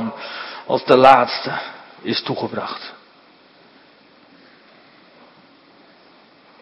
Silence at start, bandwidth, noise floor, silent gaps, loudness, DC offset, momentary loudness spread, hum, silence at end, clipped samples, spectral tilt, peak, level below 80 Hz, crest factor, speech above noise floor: 0 s; 10.5 kHz; -50 dBFS; none; -17 LUFS; under 0.1%; 21 LU; none; 3.7 s; under 0.1%; -6 dB/octave; 0 dBFS; -62 dBFS; 22 dB; 34 dB